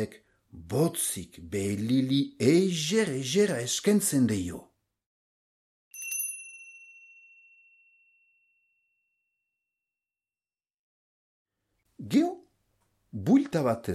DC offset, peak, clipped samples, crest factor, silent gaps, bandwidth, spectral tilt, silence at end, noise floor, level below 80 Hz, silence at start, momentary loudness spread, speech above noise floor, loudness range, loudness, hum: under 0.1%; -10 dBFS; under 0.1%; 20 dB; 5.06-5.91 s, 10.74-11.46 s; 15.5 kHz; -5 dB/octave; 0 s; under -90 dBFS; -64 dBFS; 0 s; 20 LU; over 63 dB; 13 LU; -27 LUFS; none